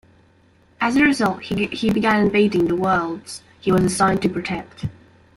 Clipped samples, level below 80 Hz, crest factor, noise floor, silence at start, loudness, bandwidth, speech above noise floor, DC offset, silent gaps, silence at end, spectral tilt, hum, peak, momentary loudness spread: under 0.1%; -48 dBFS; 16 dB; -55 dBFS; 0.8 s; -19 LUFS; 15 kHz; 36 dB; under 0.1%; none; 0.45 s; -5.5 dB/octave; none; -4 dBFS; 14 LU